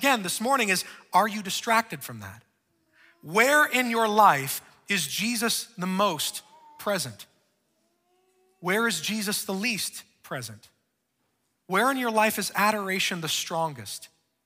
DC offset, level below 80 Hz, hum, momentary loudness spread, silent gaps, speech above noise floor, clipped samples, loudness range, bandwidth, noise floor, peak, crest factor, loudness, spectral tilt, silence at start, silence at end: under 0.1%; -74 dBFS; none; 16 LU; none; 50 dB; under 0.1%; 6 LU; 16 kHz; -76 dBFS; -4 dBFS; 22 dB; -25 LUFS; -2.5 dB/octave; 0 s; 0.4 s